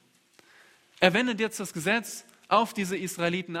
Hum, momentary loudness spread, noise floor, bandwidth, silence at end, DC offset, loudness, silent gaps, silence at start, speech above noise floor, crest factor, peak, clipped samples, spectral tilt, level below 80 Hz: none; 8 LU; -61 dBFS; 16 kHz; 0 s; under 0.1%; -27 LUFS; none; 1 s; 34 dB; 26 dB; -2 dBFS; under 0.1%; -4 dB/octave; -70 dBFS